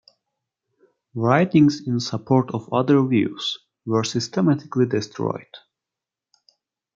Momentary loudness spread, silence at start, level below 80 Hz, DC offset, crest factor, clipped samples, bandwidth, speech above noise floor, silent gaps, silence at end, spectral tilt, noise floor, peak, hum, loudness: 10 LU; 1.15 s; -64 dBFS; under 0.1%; 20 dB; under 0.1%; 7.6 kHz; 67 dB; none; 1.4 s; -6.5 dB/octave; -88 dBFS; -2 dBFS; none; -21 LUFS